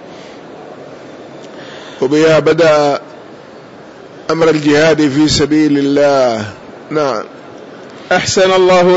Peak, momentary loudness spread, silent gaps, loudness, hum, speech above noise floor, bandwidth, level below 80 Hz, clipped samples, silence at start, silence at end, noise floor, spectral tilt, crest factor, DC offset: -2 dBFS; 23 LU; none; -11 LUFS; none; 24 dB; 8 kHz; -44 dBFS; under 0.1%; 0 s; 0 s; -34 dBFS; -5 dB/octave; 10 dB; under 0.1%